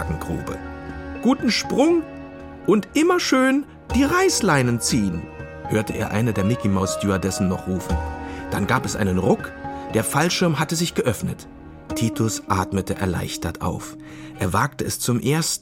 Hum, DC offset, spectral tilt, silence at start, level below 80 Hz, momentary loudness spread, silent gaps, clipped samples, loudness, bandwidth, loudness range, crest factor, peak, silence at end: none; under 0.1%; -5 dB/octave; 0 s; -40 dBFS; 14 LU; none; under 0.1%; -22 LUFS; 16.5 kHz; 5 LU; 20 dB; -2 dBFS; 0 s